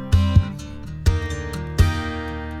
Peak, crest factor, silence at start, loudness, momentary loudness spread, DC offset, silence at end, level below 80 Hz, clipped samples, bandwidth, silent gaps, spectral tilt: -2 dBFS; 18 dB; 0 s; -22 LUFS; 12 LU; under 0.1%; 0 s; -26 dBFS; under 0.1%; 13 kHz; none; -6.5 dB/octave